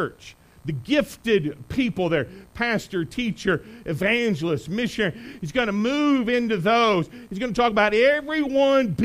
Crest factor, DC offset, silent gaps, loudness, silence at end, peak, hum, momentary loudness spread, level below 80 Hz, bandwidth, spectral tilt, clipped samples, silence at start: 16 dB; under 0.1%; none; -23 LUFS; 0 s; -6 dBFS; none; 11 LU; -50 dBFS; 15.5 kHz; -5.5 dB/octave; under 0.1%; 0 s